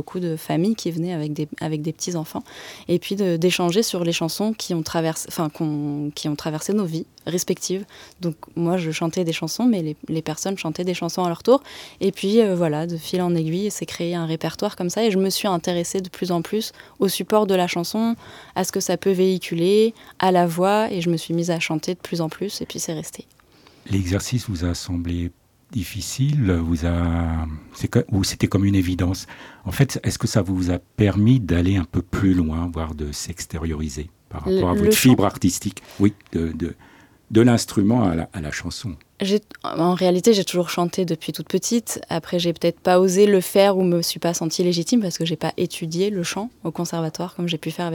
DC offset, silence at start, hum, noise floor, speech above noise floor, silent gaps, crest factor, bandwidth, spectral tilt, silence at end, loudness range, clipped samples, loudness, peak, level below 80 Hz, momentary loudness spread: under 0.1%; 0 s; none; -52 dBFS; 31 dB; none; 18 dB; 19 kHz; -5.5 dB/octave; 0 s; 5 LU; under 0.1%; -22 LUFS; -4 dBFS; -42 dBFS; 11 LU